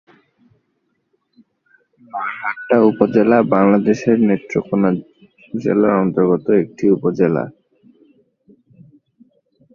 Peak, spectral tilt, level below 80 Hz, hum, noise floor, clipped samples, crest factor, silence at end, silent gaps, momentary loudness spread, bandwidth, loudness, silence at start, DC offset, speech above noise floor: 0 dBFS; -8.5 dB/octave; -58 dBFS; none; -68 dBFS; under 0.1%; 18 dB; 2.25 s; none; 12 LU; 7 kHz; -16 LUFS; 2.15 s; under 0.1%; 53 dB